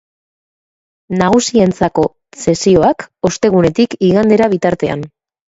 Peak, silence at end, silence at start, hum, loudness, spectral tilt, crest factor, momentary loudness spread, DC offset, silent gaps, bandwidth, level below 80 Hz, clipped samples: 0 dBFS; 0.55 s; 1.1 s; none; -13 LUFS; -5.5 dB/octave; 14 dB; 9 LU; under 0.1%; none; 8 kHz; -44 dBFS; under 0.1%